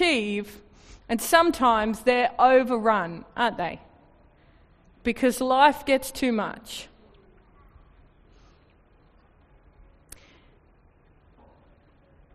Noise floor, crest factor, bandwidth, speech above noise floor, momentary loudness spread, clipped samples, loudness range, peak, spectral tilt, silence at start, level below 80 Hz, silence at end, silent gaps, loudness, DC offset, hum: -58 dBFS; 22 dB; 14 kHz; 36 dB; 14 LU; under 0.1%; 9 LU; -4 dBFS; -3.5 dB/octave; 0 s; -54 dBFS; 5.5 s; none; -23 LUFS; under 0.1%; none